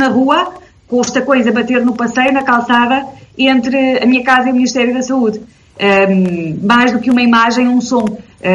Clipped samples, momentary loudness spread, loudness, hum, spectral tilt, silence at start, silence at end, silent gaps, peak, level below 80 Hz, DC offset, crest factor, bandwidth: under 0.1%; 7 LU; -12 LUFS; none; -5 dB/octave; 0 s; 0 s; none; 0 dBFS; -52 dBFS; under 0.1%; 12 dB; 7.8 kHz